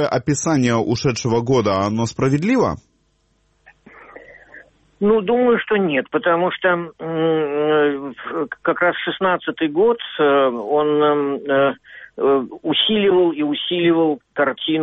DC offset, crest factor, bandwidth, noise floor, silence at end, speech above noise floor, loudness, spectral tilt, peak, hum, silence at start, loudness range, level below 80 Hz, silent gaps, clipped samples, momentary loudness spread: under 0.1%; 14 dB; 8.4 kHz; -63 dBFS; 0 s; 45 dB; -18 LUFS; -5 dB/octave; -4 dBFS; none; 0 s; 4 LU; -52 dBFS; none; under 0.1%; 6 LU